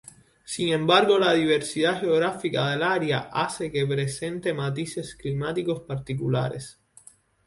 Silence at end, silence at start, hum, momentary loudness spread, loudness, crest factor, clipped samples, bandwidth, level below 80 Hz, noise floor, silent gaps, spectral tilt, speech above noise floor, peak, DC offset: 0.75 s; 0.45 s; none; 12 LU; -25 LUFS; 20 dB; under 0.1%; 11.5 kHz; -58 dBFS; -54 dBFS; none; -5 dB/octave; 29 dB; -6 dBFS; under 0.1%